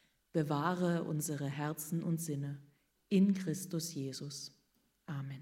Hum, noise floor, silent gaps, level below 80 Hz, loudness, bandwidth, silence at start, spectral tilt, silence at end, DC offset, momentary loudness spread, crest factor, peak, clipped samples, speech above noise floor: none; -76 dBFS; none; -78 dBFS; -37 LUFS; 16 kHz; 0.35 s; -6 dB/octave; 0 s; under 0.1%; 14 LU; 18 dB; -18 dBFS; under 0.1%; 40 dB